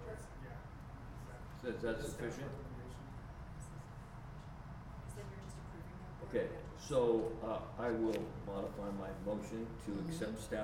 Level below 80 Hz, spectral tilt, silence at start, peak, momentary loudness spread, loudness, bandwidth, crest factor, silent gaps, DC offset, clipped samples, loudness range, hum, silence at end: -54 dBFS; -6.5 dB/octave; 0 s; -22 dBFS; 14 LU; -43 LUFS; 16.5 kHz; 22 dB; none; under 0.1%; under 0.1%; 11 LU; none; 0 s